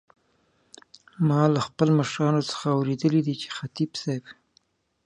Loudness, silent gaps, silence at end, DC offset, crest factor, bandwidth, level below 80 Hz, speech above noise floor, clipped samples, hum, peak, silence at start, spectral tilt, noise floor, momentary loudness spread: -25 LUFS; none; 0.75 s; under 0.1%; 20 dB; 10 kHz; -66 dBFS; 43 dB; under 0.1%; none; -6 dBFS; 1.2 s; -6.5 dB/octave; -67 dBFS; 10 LU